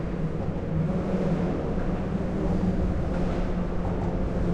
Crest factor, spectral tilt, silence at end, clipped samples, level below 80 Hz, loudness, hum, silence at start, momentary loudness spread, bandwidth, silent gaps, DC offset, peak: 12 dB; -9 dB/octave; 0 s; under 0.1%; -32 dBFS; -28 LUFS; none; 0 s; 3 LU; 8.4 kHz; none; under 0.1%; -14 dBFS